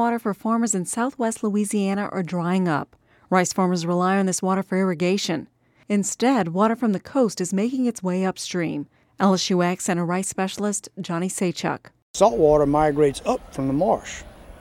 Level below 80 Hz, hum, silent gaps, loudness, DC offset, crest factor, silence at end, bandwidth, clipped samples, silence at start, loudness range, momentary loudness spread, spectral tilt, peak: -50 dBFS; none; 12.02-12.14 s; -22 LUFS; under 0.1%; 20 dB; 0 s; 15 kHz; under 0.1%; 0 s; 2 LU; 8 LU; -5 dB/octave; -2 dBFS